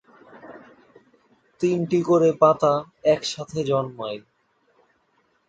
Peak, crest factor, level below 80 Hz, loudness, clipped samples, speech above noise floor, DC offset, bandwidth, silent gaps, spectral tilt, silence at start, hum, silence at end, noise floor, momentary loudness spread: -4 dBFS; 20 dB; -64 dBFS; -22 LUFS; under 0.1%; 45 dB; under 0.1%; 9 kHz; none; -6 dB/octave; 0.35 s; none; 1.3 s; -66 dBFS; 16 LU